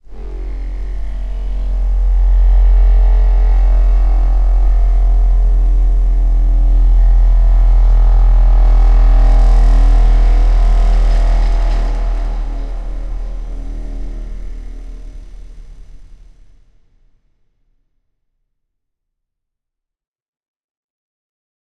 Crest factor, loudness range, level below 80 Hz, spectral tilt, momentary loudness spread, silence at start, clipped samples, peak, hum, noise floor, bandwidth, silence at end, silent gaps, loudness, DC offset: 10 dB; 16 LU; -12 dBFS; -7.5 dB/octave; 15 LU; 0.1 s; under 0.1%; -2 dBFS; none; -80 dBFS; 3.3 kHz; 5.7 s; none; -15 LUFS; under 0.1%